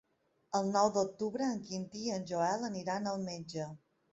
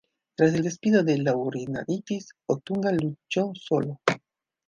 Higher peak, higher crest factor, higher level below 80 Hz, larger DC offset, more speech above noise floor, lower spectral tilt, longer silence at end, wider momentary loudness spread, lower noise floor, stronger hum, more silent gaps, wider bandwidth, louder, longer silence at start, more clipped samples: second, -16 dBFS vs -2 dBFS; about the same, 20 dB vs 24 dB; second, -74 dBFS vs -66 dBFS; neither; about the same, 37 dB vs 36 dB; second, -5 dB/octave vs -6.5 dB/octave; second, 0.35 s vs 0.5 s; about the same, 11 LU vs 9 LU; first, -72 dBFS vs -61 dBFS; neither; neither; second, 8 kHz vs 9.6 kHz; second, -35 LUFS vs -26 LUFS; about the same, 0.5 s vs 0.4 s; neither